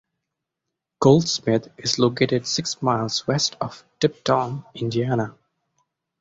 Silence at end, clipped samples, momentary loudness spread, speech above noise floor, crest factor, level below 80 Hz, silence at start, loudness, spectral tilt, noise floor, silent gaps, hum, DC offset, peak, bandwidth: 0.9 s; under 0.1%; 11 LU; 61 dB; 22 dB; -58 dBFS; 1 s; -22 LUFS; -5 dB/octave; -83 dBFS; none; none; under 0.1%; -2 dBFS; 8 kHz